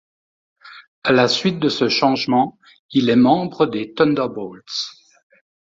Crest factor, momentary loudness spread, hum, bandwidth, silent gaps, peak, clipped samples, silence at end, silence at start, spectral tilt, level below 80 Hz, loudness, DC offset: 18 dB; 11 LU; none; 7.8 kHz; 0.88-1.02 s, 2.79-2.89 s; -2 dBFS; under 0.1%; 0.9 s; 0.65 s; -5.5 dB/octave; -60 dBFS; -18 LUFS; under 0.1%